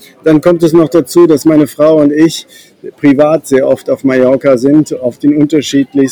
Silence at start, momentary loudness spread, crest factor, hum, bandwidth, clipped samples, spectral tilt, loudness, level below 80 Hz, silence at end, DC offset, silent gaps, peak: 0.25 s; 5 LU; 8 dB; none; 19.5 kHz; 2%; -6.5 dB/octave; -9 LUFS; -48 dBFS; 0 s; 0.1%; none; 0 dBFS